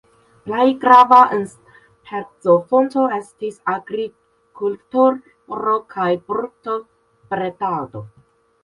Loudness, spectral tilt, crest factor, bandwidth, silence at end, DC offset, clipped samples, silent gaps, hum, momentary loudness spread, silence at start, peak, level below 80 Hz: -17 LUFS; -6.5 dB/octave; 18 dB; 11.5 kHz; 0.55 s; under 0.1%; under 0.1%; none; none; 19 LU; 0.45 s; 0 dBFS; -64 dBFS